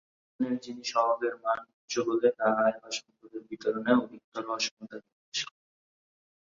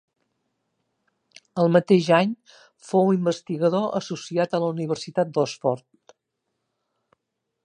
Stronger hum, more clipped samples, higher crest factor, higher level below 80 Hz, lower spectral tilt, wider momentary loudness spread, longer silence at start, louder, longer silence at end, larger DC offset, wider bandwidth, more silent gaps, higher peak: neither; neither; about the same, 22 dB vs 22 dB; about the same, -76 dBFS vs -72 dBFS; second, -3.5 dB/octave vs -6.5 dB/octave; first, 16 LU vs 10 LU; second, 0.4 s vs 1.55 s; second, -30 LUFS vs -23 LUFS; second, 1 s vs 1.85 s; neither; second, 7.6 kHz vs 10 kHz; first, 1.73-1.88 s, 4.24-4.32 s, 4.71-4.77 s, 5.12-5.32 s vs none; second, -10 dBFS vs -2 dBFS